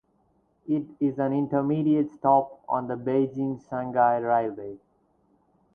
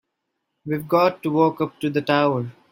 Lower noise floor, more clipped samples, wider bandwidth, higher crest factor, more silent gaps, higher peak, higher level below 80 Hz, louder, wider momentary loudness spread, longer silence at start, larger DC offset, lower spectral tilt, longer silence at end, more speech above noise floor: second, -67 dBFS vs -78 dBFS; neither; second, 3.6 kHz vs 17 kHz; about the same, 18 dB vs 18 dB; neither; second, -8 dBFS vs -4 dBFS; about the same, -66 dBFS vs -64 dBFS; second, -26 LUFS vs -21 LUFS; about the same, 10 LU vs 10 LU; about the same, 0.65 s vs 0.65 s; neither; first, -10.5 dB/octave vs -7.5 dB/octave; first, 1 s vs 0.2 s; second, 42 dB vs 57 dB